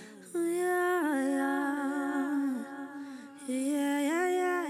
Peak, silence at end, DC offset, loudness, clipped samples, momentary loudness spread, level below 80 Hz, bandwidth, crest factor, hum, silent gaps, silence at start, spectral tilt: -18 dBFS; 0 s; under 0.1%; -31 LUFS; under 0.1%; 13 LU; under -90 dBFS; 15 kHz; 12 dB; none; none; 0 s; -3.5 dB/octave